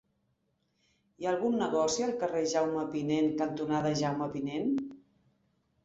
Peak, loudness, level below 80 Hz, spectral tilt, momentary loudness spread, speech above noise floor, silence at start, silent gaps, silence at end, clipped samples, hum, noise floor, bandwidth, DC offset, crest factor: -18 dBFS; -31 LUFS; -68 dBFS; -5 dB/octave; 5 LU; 46 dB; 1.2 s; none; 0.85 s; under 0.1%; none; -76 dBFS; 8 kHz; under 0.1%; 16 dB